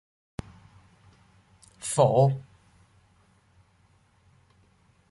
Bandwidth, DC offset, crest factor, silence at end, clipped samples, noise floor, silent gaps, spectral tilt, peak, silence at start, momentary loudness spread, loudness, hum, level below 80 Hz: 11.5 kHz; under 0.1%; 24 dB; 2.7 s; under 0.1%; -63 dBFS; none; -6 dB/octave; -8 dBFS; 1.8 s; 22 LU; -24 LUFS; none; -60 dBFS